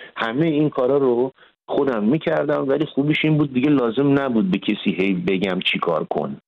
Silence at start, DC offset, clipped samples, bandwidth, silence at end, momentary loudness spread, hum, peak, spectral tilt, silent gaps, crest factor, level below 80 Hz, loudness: 0 s; under 0.1%; under 0.1%; 6 kHz; 0.1 s; 4 LU; none; -6 dBFS; -8.5 dB/octave; none; 12 dB; -58 dBFS; -20 LUFS